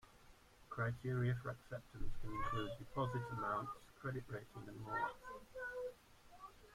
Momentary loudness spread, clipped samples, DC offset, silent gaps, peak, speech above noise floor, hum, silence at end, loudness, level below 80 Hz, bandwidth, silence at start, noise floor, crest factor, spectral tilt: 14 LU; under 0.1%; under 0.1%; none; -28 dBFS; 22 dB; none; 0 s; -45 LUFS; -56 dBFS; 15.5 kHz; 0.05 s; -65 dBFS; 16 dB; -7 dB/octave